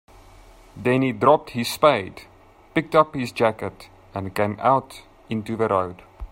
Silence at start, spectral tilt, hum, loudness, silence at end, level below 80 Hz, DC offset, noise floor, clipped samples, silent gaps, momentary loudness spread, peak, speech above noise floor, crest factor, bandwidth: 0.75 s; -6 dB/octave; none; -22 LUFS; 0.05 s; -50 dBFS; under 0.1%; -48 dBFS; under 0.1%; none; 15 LU; 0 dBFS; 26 dB; 22 dB; 16 kHz